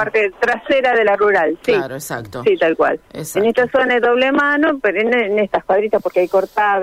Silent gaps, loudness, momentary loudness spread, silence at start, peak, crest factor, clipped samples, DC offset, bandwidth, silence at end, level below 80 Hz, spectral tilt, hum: none; -16 LUFS; 5 LU; 0 s; -6 dBFS; 10 dB; under 0.1%; under 0.1%; 16 kHz; 0 s; -52 dBFS; -4.5 dB/octave; none